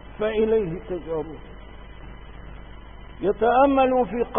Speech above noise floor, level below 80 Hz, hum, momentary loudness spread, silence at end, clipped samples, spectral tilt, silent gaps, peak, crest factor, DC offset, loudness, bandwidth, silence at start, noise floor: 19 dB; -42 dBFS; none; 26 LU; 0 s; under 0.1%; -11 dB/octave; none; -6 dBFS; 18 dB; 0.3%; -22 LUFS; 3.7 kHz; 0 s; -41 dBFS